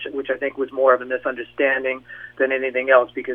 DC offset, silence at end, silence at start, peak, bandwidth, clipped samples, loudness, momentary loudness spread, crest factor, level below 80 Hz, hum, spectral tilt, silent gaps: under 0.1%; 0 s; 0 s; 0 dBFS; 3.7 kHz; under 0.1%; -20 LUFS; 10 LU; 20 dB; -64 dBFS; none; -6.5 dB/octave; none